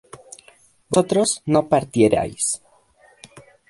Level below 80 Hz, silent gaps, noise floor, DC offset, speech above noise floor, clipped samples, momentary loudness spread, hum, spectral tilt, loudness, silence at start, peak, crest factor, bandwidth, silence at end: -52 dBFS; none; -55 dBFS; under 0.1%; 36 dB; under 0.1%; 12 LU; none; -4.5 dB/octave; -20 LUFS; 0.9 s; -2 dBFS; 20 dB; 11.5 kHz; 1.15 s